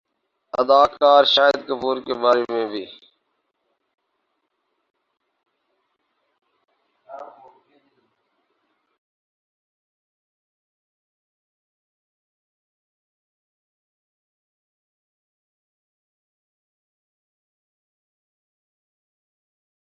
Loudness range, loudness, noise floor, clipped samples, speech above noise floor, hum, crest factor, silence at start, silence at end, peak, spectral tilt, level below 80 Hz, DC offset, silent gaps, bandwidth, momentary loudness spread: 15 LU; -18 LUFS; -74 dBFS; under 0.1%; 56 dB; none; 24 dB; 0.55 s; 12.75 s; -2 dBFS; -3.5 dB/octave; -70 dBFS; under 0.1%; none; 7.2 kHz; 26 LU